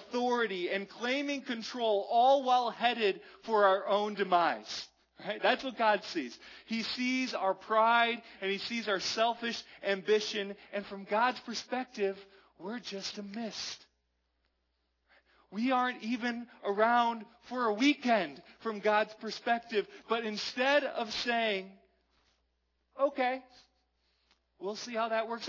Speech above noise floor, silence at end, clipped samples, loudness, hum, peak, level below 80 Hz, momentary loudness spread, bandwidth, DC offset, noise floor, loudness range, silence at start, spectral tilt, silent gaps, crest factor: 47 dB; 0 s; under 0.1%; -32 LUFS; none; -12 dBFS; -78 dBFS; 13 LU; 6 kHz; under 0.1%; -79 dBFS; 8 LU; 0 s; -3.5 dB/octave; none; 20 dB